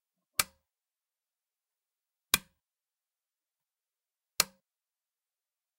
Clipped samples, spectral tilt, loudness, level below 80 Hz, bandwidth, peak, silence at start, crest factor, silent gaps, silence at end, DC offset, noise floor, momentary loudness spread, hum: under 0.1%; 0.5 dB/octave; -32 LUFS; -68 dBFS; 16 kHz; -6 dBFS; 0.4 s; 34 dB; none; 1.35 s; under 0.1%; under -90 dBFS; 7 LU; none